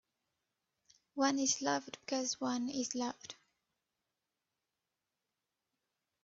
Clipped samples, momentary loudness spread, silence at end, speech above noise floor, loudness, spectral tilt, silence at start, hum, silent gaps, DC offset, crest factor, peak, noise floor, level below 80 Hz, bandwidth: under 0.1%; 17 LU; 2.9 s; 53 dB; -36 LUFS; -2 dB/octave; 1.15 s; none; none; under 0.1%; 22 dB; -18 dBFS; -89 dBFS; -84 dBFS; 8 kHz